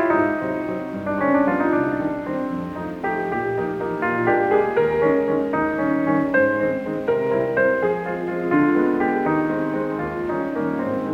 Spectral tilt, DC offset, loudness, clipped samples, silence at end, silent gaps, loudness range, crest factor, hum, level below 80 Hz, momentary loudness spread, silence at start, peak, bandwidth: -8.5 dB/octave; under 0.1%; -21 LUFS; under 0.1%; 0 s; none; 3 LU; 16 dB; none; -52 dBFS; 7 LU; 0 s; -6 dBFS; 7 kHz